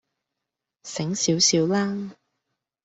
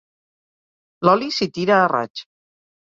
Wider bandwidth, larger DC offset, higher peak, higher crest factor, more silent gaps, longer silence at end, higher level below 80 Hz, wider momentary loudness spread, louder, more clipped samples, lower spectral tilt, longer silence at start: about the same, 8.2 kHz vs 7.8 kHz; neither; second, -6 dBFS vs -2 dBFS; about the same, 20 dB vs 20 dB; second, none vs 2.10-2.15 s; about the same, 0.7 s vs 0.65 s; about the same, -66 dBFS vs -64 dBFS; first, 16 LU vs 12 LU; second, -22 LUFS vs -18 LUFS; neither; second, -3.5 dB/octave vs -5.5 dB/octave; second, 0.85 s vs 1 s